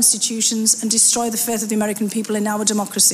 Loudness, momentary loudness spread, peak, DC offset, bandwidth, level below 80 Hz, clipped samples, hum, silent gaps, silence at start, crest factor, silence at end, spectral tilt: -17 LUFS; 8 LU; -2 dBFS; under 0.1%; 16 kHz; -62 dBFS; under 0.1%; none; none; 0 s; 16 dB; 0 s; -2 dB/octave